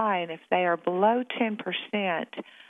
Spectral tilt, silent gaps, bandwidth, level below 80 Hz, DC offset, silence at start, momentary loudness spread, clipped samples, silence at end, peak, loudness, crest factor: -7.5 dB/octave; none; 3.9 kHz; -86 dBFS; under 0.1%; 0 s; 7 LU; under 0.1%; 0.3 s; -8 dBFS; -27 LUFS; 18 dB